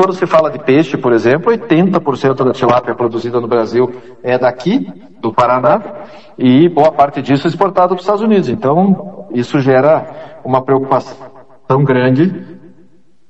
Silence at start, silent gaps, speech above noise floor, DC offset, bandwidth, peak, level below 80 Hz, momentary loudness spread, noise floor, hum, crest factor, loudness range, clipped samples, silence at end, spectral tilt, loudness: 0 s; none; 38 dB; 0.8%; 8.2 kHz; 0 dBFS; -52 dBFS; 8 LU; -50 dBFS; none; 12 dB; 3 LU; 0.1%; 0.7 s; -8 dB/octave; -12 LUFS